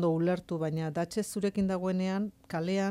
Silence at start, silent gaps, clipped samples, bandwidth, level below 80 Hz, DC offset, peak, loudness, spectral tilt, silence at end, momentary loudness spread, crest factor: 0 s; none; under 0.1%; 15 kHz; -62 dBFS; under 0.1%; -18 dBFS; -32 LUFS; -6.5 dB/octave; 0 s; 4 LU; 12 dB